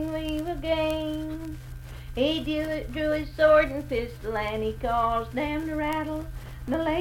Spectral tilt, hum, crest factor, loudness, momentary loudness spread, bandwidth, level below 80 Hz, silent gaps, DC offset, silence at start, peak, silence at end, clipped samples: -6 dB/octave; none; 18 dB; -27 LUFS; 15 LU; 17 kHz; -40 dBFS; none; under 0.1%; 0 s; -10 dBFS; 0 s; under 0.1%